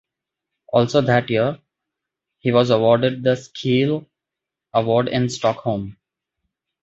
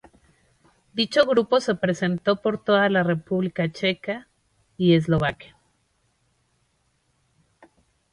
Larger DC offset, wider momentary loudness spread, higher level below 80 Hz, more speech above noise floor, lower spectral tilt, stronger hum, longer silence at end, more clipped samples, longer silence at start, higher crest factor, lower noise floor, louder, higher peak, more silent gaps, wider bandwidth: neither; about the same, 10 LU vs 10 LU; about the same, -56 dBFS vs -56 dBFS; first, 67 dB vs 47 dB; about the same, -6.5 dB/octave vs -6.5 dB/octave; neither; second, 0.9 s vs 2.7 s; neither; second, 0.7 s vs 0.95 s; about the same, 18 dB vs 22 dB; first, -85 dBFS vs -69 dBFS; first, -19 LUFS vs -22 LUFS; about the same, -2 dBFS vs -4 dBFS; neither; second, 8 kHz vs 11 kHz